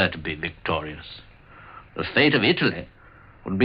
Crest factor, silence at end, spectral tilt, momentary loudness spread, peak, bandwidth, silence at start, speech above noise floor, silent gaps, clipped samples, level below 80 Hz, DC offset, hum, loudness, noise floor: 20 dB; 0 s; -9 dB/octave; 24 LU; -4 dBFS; 5.6 kHz; 0 s; 25 dB; none; under 0.1%; -50 dBFS; under 0.1%; none; -23 LUFS; -49 dBFS